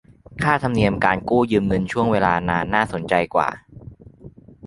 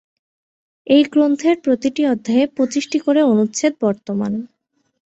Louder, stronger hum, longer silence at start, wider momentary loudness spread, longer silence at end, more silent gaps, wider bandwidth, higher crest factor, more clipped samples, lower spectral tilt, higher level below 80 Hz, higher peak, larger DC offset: second, -20 LUFS vs -17 LUFS; neither; second, 0.3 s vs 0.85 s; second, 4 LU vs 8 LU; second, 0 s vs 0.6 s; neither; first, 11.5 kHz vs 8.2 kHz; about the same, 20 dB vs 16 dB; neither; first, -7 dB/octave vs -5 dB/octave; first, -44 dBFS vs -62 dBFS; about the same, 0 dBFS vs -2 dBFS; neither